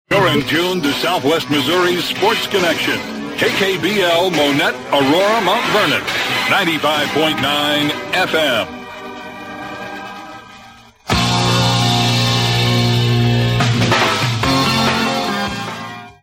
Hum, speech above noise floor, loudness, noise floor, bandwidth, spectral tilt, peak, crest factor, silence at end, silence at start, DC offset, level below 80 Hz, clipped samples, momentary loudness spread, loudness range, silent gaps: none; 26 dB; -15 LUFS; -41 dBFS; 16.5 kHz; -4.5 dB/octave; -2 dBFS; 14 dB; 0.1 s; 0.1 s; under 0.1%; -42 dBFS; under 0.1%; 14 LU; 5 LU; none